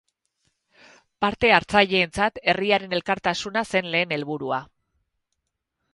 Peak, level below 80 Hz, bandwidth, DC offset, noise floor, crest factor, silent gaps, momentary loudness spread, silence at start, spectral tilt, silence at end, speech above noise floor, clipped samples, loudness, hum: 0 dBFS; -54 dBFS; 11.5 kHz; under 0.1%; -80 dBFS; 24 dB; none; 10 LU; 1.2 s; -4.5 dB/octave; 1.3 s; 57 dB; under 0.1%; -22 LUFS; none